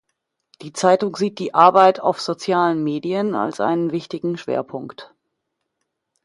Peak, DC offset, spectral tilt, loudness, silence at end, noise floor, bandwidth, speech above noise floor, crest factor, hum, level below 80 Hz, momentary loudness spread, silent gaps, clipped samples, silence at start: 0 dBFS; under 0.1%; -5.5 dB/octave; -19 LUFS; 1.2 s; -77 dBFS; 11.5 kHz; 58 dB; 20 dB; none; -68 dBFS; 12 LU; none; under 0.1%; 0.6 s